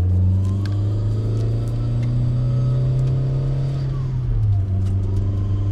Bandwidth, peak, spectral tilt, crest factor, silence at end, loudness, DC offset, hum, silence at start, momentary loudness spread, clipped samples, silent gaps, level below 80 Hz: 5.8 kHz; -10 dBFS; -9.5 dB/octave; 10 dB; 0 s; -21 LUFS; under 0.1%; none; 0 s; 3 LU; under 0.1%; none; -30 dBFS